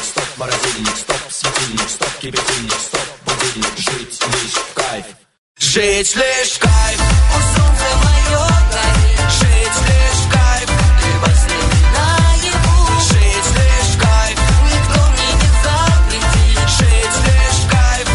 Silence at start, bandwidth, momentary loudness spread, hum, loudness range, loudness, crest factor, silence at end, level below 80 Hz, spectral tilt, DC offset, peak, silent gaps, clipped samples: 0 s; 11.5 kHz; 6 LU; none; 5 LU; -13 LUFS; 12 dB; 0 s; -14 dBFS; -3.5 dB/octave; under 0.1%; -2 dBFS; 5.38-5.55 s; under 0.1%